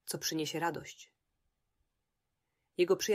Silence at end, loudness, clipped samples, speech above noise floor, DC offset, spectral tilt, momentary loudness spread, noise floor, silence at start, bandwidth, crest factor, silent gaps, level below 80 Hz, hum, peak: 0 s; -35 LUFS; under 0.1%; 52 dB; under 0.1%; -3.5 dB/octave; 18 LU; -86 dBFS; 0.05 s; 16 kHz; 20 dB; none; -76 dBFS; none; -18 dBFS